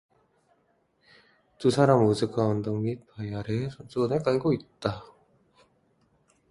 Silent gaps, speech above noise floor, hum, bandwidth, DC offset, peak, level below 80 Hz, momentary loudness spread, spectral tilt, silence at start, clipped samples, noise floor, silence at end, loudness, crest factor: none; 43 dB; none; 11.5 kHz; under 0.1%; -8 dBFS; -58 dBFS; 13 LU; -7 dB/octave; 1.6 s; under 0.1%; -69 dBFS; 1.5 s; -27 LUFS; 22 dB